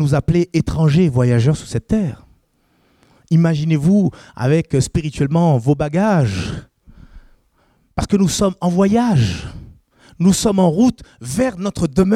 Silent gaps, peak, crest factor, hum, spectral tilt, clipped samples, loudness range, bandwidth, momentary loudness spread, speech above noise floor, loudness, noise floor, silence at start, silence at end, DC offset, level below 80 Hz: none; -4 dBFS; 14 dB; none; -6.5 dB/octave; under 0.1%; 3 LU; 14 kHz; 10 LU; 44 dB; -17 LUFS; -60 dBFS; 0 s; 0 s; under 0.1%; -38 dBFS